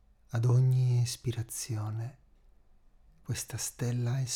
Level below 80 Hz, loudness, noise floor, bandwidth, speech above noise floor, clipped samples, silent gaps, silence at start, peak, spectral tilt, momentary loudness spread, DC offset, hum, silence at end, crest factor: -60 dBFS; -31 LUFS; -60 dBFS; 16 kHz; 30 dB; under 0.1%; none; 0.3 s; -18 dBFS; -5.5 dB/octave; 13 LU; under 0.1%; none; 0 s; 14 dB